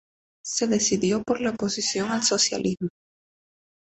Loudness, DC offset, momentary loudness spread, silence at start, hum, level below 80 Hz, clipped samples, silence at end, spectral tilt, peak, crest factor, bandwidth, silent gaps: -24 LUFS; under 0.1%; 9 LU; 0.45 s; none; -60 dBFS; under 0.1%; 1 s; -3 dB/octave; -8 dBFS; 18 dB; 8.4 kHz; none